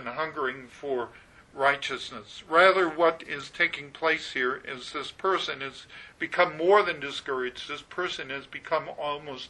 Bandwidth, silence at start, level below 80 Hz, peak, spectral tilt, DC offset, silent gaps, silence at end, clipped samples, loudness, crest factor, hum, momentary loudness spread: 11 kHz; 0 s; -64 dBFS; -4 dBFS; -3.5 dB/octave; under 0.1%; none; 0 s; under 0.1%; -27 LUFS; 24 dB; none; 15 LU